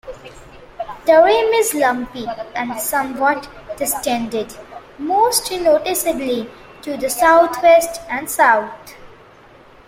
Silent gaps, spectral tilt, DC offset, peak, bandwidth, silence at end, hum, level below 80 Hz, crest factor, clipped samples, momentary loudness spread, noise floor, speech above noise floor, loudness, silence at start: none; -2 dB/octave; under 0.1%; -2 dBFS; 16.5 kHz; 0.75 s; none; -48 dBFS; 16 dB; under 0.1%; 20 LU; -45 dBFS; 28 dB; -16 LUFS; 0.05 s